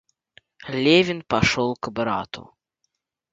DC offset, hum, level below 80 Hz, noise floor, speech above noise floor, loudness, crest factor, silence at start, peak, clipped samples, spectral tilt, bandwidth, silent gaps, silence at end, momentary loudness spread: under 0.1%; none; -48 dBFS; -76 dBFS; 55 dB; -21 LUFS; 20 dB; 0.6 s; -4 dBFS; under 0.1%; -5 dB/octave; 7.8 kHz; none; 0.9 s; 19 LU